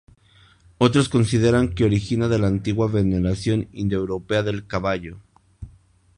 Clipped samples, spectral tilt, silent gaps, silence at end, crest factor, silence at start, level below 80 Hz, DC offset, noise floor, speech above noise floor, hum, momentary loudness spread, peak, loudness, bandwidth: under 0.1%; -6.5 dB/octave; none; 0.5 s; 20 dB; 0.8 s; -40 dBFS; under 0.1%; -54 dBFS; 34 dB; none; 7 LU; -2 dBFS; -21 LUFS; 11 kHz